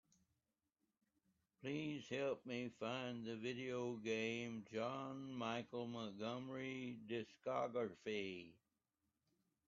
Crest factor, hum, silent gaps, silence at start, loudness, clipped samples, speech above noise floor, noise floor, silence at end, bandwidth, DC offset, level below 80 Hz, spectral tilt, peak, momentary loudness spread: 18 dB; none; none; 1.6 s; -47 LUFS; under 0.1%; over 44 dB; under -90 dBFS; 1.15 s; 7.4 kHz; under 0.1%; -86 dBFS; -4 dB/octave; -30 dBFS; 6 LU